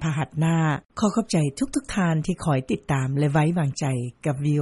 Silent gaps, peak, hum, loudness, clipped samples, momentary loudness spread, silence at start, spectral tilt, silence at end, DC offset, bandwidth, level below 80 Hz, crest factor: 0.85-0.89 s; -8 dBFS; none; -24 LUFS; under 0.1%; 5 LU; 0 s; -6.5 dB/octave; 0 s; under 0.1%; 11.5 kHz; -48 dBFS; 16 dB